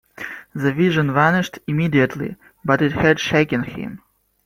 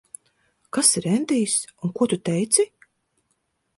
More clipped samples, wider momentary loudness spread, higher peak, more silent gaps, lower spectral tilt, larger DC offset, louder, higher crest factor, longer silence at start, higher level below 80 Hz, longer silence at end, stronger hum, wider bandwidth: neither; first, 14 LU vs 9 LU; about the same, -2 dBFS vs 0 dBFS; neither; first, -6.5 dB/octave vs -3.5 dB/octave; neither; about the same, -19 LUFS vs -21 LUFS; second, 18 dB vs 24 dB; second, 0.2 s vs 0.75 s; first, -50 dBFS vs -66 dBFS; second, 0.5 s vs 1.1 s; neither; first, 16 kHz vs 12 kHz